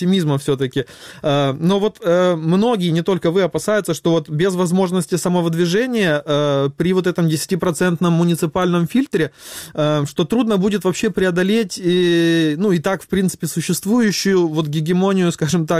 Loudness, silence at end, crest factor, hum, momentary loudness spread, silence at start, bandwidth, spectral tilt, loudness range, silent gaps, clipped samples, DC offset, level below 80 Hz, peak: -17 LUFS; 0 s; 10 dB; none; 4 LU; 0 s; 15.5 kHz; -6 dB/octave; 1 LU; none; under 0.1%; under 0.1%; -52 dBFS; -6 dBFS